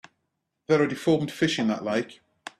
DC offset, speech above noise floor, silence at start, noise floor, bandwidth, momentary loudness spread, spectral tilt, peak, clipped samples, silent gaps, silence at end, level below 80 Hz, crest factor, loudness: under 0.1%; 54 dB; 0.7 s; -79 dBFS; 13.5 kHz; 9 LU; -5.5 dB/octave; -8 dBFS; under 0.1%; none; 0.1 s; -64 dBFS; 18 dB; -25 LUFS